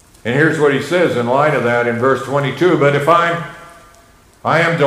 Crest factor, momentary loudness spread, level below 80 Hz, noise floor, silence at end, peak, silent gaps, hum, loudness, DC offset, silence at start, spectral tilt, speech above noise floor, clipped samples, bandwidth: 14 dB; 6 LU; -54 dBFS; -47 dBFS; 0 s; 0 dBFS; none; none; -14 LUFS; under 0.1%; 0.25 s; -6 dB/octave; 33 dB; under 0.1%; 15.5 kHz